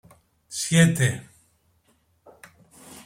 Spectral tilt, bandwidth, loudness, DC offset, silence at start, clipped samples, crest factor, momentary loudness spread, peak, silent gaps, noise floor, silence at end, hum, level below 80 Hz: -4.5 dB/octave; 16 kHz; -22 LUFS; under 0.1%; 0.5 s; under 0.1%; 22 dB; 19 LU; -6 dBFS; none; -65 dBFS; 0.05 s; none; -58 dBFS